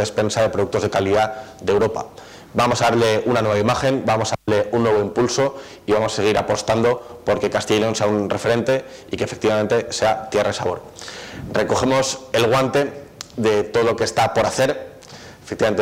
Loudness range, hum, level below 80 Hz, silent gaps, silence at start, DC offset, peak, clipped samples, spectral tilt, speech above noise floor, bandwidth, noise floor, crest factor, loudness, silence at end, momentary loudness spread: 2 LU; none; -48 dBFS; none; 0 s; under 0.1%; -6 dBFS; under 0.1%; -4.5 dB/octave; 21 dB; 16 kHz; -40 dBFS; 12 dB; -19 LUFS; 0 s; 13 LU